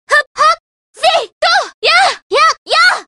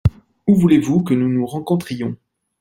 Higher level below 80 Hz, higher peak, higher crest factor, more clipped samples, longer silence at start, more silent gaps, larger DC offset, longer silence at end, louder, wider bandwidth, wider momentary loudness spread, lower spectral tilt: second, -58 dBFS vs -40 dBFS; about the same, 0 dBFS vs -2 dBFS; about the same, 12 dB vs 16 dB; neither; about the same, 0.1 s vs 0.05 s; first, 0.27-0.35 s, 0.60-0.94 s, 1.32-1.41 s, 1.74-1.82 s, 2.22-2.30 s, 2.58-2.66 s vs none; neither; second, 0.05 s vs 0.45 s; first, -11 LUFS vs -18 LUFS; about the same, 15.5 kHz vs 15.5 kHz; second, 4 LU vs 13 LU; second, 1 dB/octave vs -8 dB/octave